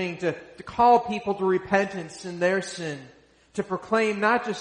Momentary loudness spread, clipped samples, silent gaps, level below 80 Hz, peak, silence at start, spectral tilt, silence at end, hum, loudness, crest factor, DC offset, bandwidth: 16 LU; under 0.1%; none; -60 dBFS; -6 dBFS; 0 s; -5 dB/octave; 0 s; none; -25 LUFS; 18 dB; under 0.1%; 10.5 kHz